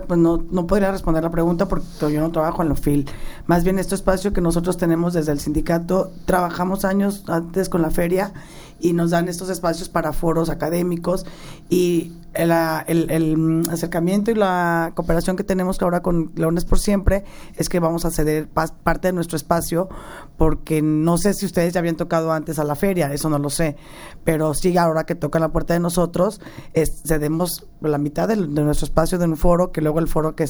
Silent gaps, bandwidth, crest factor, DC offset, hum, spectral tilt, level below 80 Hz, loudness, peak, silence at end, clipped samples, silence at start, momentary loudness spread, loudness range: none; over 20 kHz; 18 dB; under 0.1%; none; -6 dB/octave; -30 dBFS; -21 LUFS; -2 dBFS; 0 s; under 0.1%; 0 s; 5 LU; 2 LU